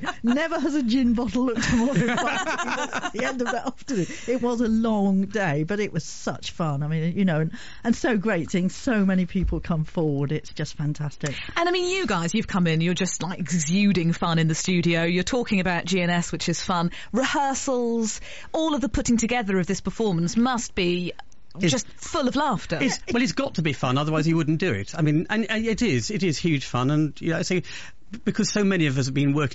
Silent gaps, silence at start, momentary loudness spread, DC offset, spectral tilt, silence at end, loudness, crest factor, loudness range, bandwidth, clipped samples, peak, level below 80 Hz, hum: none; 0 s; 7 LU; 1%; -5 dB/octave; 0 s; -24 LUFS; 12 dB; 3 LU; 8 kHz; under 0.1%; -10 dBFS; -44 dBFS; none